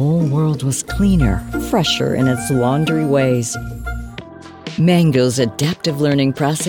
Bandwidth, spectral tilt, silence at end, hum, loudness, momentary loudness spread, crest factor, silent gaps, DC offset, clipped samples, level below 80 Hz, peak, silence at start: 18.5 kHz; -5.5 dB/octave; 0 s; none; -16 LUFS; 13 LU; 14 dB; none; 0.2%; under 0.1%; -32 dBFS; -2 dBFS; 0 s